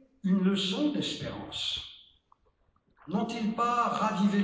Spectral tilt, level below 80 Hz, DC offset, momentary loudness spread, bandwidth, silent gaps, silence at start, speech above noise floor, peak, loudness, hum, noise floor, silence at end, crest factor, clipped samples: -5.5 dB/octave; -62 dBFS; under 0.1%; 9 LU; 8 kHz; none; 0.25 s; 41 dB; -16 dBFS; -30 LUFS; none; -70 dBFS; 0 s; 14 dB; under 0.1%